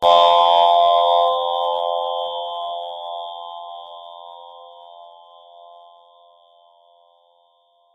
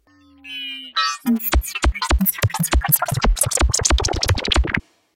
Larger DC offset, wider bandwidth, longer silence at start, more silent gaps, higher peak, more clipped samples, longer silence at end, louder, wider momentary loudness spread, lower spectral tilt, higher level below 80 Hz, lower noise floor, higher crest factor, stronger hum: neither; second, 8.2 kHz vs 17 kHz; second, 0 s vs 0.45 s; neither; about the same, -2 dBFS vs 0 dBFS; neither; first, 2.85 s vs 0.35 s; about the same, -17 LUFS vs -19 LUFS; first, 25 LU vs 8 LU; second, -2 dB/octave vs -3.5 dB/octave; second, -68 dBFS vs -24 dBFS; first, -60 dBFS vs -45 dBFS; about the same, 18 dB vs 20 dB; neither